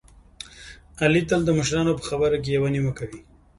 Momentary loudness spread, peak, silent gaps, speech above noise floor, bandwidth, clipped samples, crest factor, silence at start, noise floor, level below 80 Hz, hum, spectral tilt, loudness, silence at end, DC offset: 20 LU; -6 dBFS; none; 23 dB; 11.5 kHz; under 0.1%; 18 dB; 0.4 s; -45 dBFS; -46 dBFS; none; -5.5 dB/octave; -23 LUFS; 0.4 s; under 0.1%